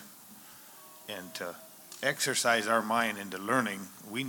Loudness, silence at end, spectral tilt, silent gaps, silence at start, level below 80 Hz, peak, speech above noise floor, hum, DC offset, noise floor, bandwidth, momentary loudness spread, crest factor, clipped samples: -31 LUFS; 0 s; -2.5 dB/octave; none; 0 s; -84 dBFS; -12 dBFS; 21 dB; none; under 0.1%; -52 dBFS; 19.5 kHz; 22 LU; 22 dB; under 0.1%